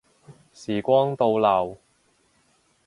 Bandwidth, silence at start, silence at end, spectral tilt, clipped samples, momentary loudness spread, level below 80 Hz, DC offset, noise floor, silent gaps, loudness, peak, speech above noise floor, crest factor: 11.5 kHz; 0.3 s; 1.1 s; -7 dB/octave; under 0.1%; 12 LU; -62 dBFS; under 0.1%; -65 dBFS; none; -22 LUFS; -6 dBFS; 43 dB; 20 dB